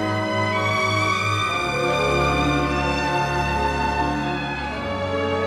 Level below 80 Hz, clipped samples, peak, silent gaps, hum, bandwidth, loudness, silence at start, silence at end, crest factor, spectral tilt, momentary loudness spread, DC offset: -36 dBFS; under 0.1%; -8 dBFS; none; none; 14.5 kHz; -21 LUFS; 0 s; 0 s; 14 dB; -5 dB/octave; 5 LU; under 0.1%